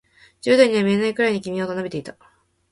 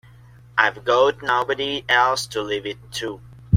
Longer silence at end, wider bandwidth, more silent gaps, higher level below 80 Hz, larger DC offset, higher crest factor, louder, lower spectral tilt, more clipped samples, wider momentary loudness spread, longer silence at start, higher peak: first, 0.6 s vs 0 s; second, 11.5 kHz vs 16.5 kHz; neither; second, -62 dBFS vs -54 dBFS; neither; about the same, 20 dB vs 20 dB; about the same, -20 LUFS vs -21 LUFS; first, -5.5 dB/octave vs -4 dB/octave; neither; first, 15 LU vs 12 LU; about the same, 0.45 s vs 0.55 s; about the same, -2 dBFS vs -2 dBFS